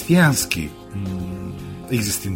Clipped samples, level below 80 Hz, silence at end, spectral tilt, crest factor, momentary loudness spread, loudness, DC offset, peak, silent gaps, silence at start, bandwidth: under 0.1%; -44 dBFS; 0 s; -4.5 dB/octave; 18 dB; 16 LU; -22 LUFS; under 0.1%; -2 dBFS; none; 0 s; 16.5 kHz